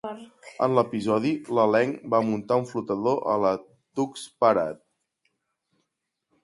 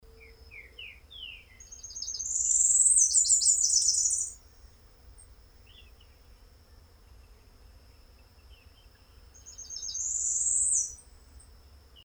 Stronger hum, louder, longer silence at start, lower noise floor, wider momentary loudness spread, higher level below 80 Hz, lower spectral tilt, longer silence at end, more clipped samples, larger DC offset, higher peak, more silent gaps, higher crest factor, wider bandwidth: neither; about the same, -25 LUFS vs -23 LUFS; second, 0.05 s vs 0.45 s; first, -81 dBFS vs -56 dBFS; second, 12 LU vs 26 LU; second, -68 dBFS vs -56 dBFS; first, -6.5 dB/octave vs 2.5 dB/octave; first, 1.7 s vs 0.65 s; neither; neither; about the same, -6 dBFS vs -8 dBFS; neither; about the same, 20 dB vs 24 dB; second, 11.5 kHz vs over 20 kHz